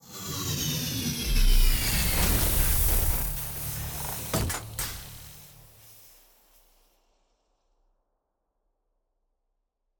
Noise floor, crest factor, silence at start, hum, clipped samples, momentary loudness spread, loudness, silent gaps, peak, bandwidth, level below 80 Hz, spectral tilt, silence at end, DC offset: -78 dBFS; 18 dB; 0.1 s; none; under 0.1%; 12 LU; -27 LUFS; none; -10 dBFS; 19.5 kHz; -30 dBFS; -3 dB/octave; 4.05 s; under 0.1%